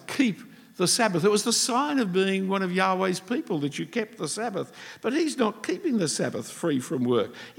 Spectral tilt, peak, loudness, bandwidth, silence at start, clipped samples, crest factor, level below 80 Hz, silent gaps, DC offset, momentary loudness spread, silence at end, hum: -4 dB/octave; -8 dBFS; -26 LUFS; 17.5 kHz; 0 s; under 0.1%; 18 dB; -80 dBFS; none; under 0.1%; 9 LU; 0.05 s; none